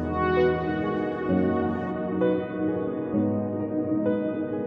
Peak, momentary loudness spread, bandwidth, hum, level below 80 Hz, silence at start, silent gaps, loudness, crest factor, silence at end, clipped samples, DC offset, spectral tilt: -10 dBFS; 5 LU; 5.4 kHz; none; -50 dBFS; 0 s; none; -26 LUFS; 14 dB; 0 s; under 0.1%; under 0.1%; -10 dB/octave